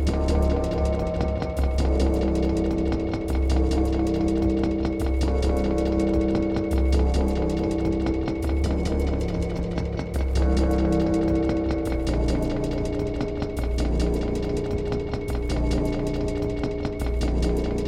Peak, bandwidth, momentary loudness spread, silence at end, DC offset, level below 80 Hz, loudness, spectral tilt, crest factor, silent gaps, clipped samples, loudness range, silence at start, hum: -10 dBFS; 11.5 kHz; 5 LU; 0 s; under 0.1%; -26 dBFS; -25 LUFS; -7.5 dB/octave; 14 dB; none; under 0.1%; 3 LU; 0 s; none